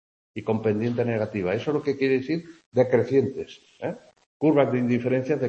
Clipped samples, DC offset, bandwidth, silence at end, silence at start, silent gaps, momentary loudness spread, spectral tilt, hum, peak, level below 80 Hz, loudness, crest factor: under 0.1%; under 0.1%; 8 kHz; 0 s; 0.35 s; 2.66-2.72 s, 4.26-4.40 s; 13 LU; -8 dB/octave; none; -6 dBFS; -64 dBFS; -25 LUFS; 18 dB